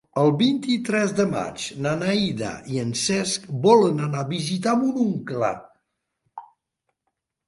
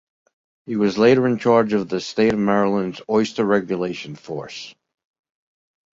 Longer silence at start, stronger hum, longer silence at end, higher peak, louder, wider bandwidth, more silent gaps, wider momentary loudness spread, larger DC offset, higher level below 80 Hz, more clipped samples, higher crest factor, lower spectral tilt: second, 0.15 s vs 0.7 s; neither; second, 1.05 s vs 1.25 s; about the same, -4 dBFS vs -2 dBFS; second, -22 LUFS vs -19 LUFS; first, 11.5 kHz vs 7.8 kHz; neither; second, 10 LU vs 16 LU; neither; about the same, -60 dBFS vs -58 dBFS; neither; about the same, 20 dB vs 18 dB; second, -5 dB/octave vs -6.5 dB/octave